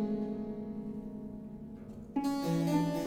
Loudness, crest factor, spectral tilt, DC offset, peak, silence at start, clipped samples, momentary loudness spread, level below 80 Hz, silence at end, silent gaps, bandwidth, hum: -36 LUFS; 16 dB; -7 dB/octave; under 0.1%; -18 dBFS; 0 s; under 0.1%; 15 LU; -58 dBFS; 0 s; none; 16.5 kHz; none